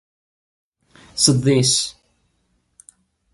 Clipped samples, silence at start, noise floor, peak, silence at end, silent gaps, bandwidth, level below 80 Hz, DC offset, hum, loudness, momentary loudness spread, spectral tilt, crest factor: under 0.1%; 1.15 s; -67 dBFS; 0 dBFS; 1.4 s; none; 11.5 kHz; -56 dBFS; under 0.1%; none; -17 LUFS; 13 LU; -4 dB/octave; 22 dB